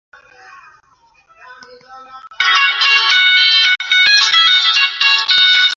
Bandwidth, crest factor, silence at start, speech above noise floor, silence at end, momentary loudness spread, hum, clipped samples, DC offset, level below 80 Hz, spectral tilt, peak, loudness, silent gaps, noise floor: 7.8 kHz; 14 dB; 1.5 s; 33 dB; 0 s; 3 LU; none; under 0.1%; under 0.1%; -66 dBFS; 4 dB/octave; 0 dBFS; -9 LUFS; none; -51 dBFS